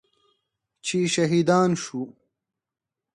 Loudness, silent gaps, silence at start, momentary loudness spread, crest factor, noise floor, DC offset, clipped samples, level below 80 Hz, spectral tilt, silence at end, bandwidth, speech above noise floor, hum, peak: -23 LUFS; none; 0.85 s; 14 LU; 18 dB; -88 dBFS; under 0.1%; under 0.1%; -68 dBFS; -5 dB/octave; 1.05 s; 11.5 kHz; 66 dB; none; -8 dBFS